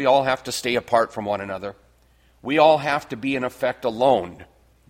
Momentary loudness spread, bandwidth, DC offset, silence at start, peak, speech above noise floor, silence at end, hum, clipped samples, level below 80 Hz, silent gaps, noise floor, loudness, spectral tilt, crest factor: 15 LU; 16.5 kHz; under 0.1%; 0 s; -4 dBFS; 36 dB; 0.45 s; none; under 0.1%; -58 dBFS; none; -58 dBFS; -21 LUFS; -4.5 dB/octave; 18 dB